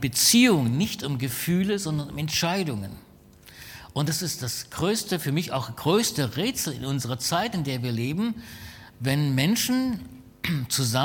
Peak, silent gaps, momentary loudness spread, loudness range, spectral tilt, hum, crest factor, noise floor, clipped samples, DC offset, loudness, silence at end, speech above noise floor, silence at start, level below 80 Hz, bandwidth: -6 dBFS; none; 12 LU; 3 LU; -4 dB/octave; none; 20 dB; -51 dBFS; under 0.1%; under 0.1%; -25 LUFS; 0 s; 26 dB; 0 s; -54 dBFS; 19 kHz